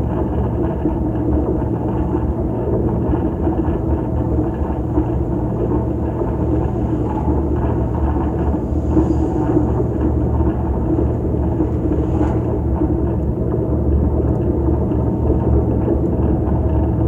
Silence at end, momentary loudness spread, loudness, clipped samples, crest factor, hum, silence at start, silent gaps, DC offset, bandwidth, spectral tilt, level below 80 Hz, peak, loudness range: 0 s; 3 LU; -19 LUFS; under 0.1%; 14 dB; none; 0 s; none; under 0.1%; 3.2 kHz; -11.5 dB/octave; -22 dBFS; -2 dBFS; 2 LU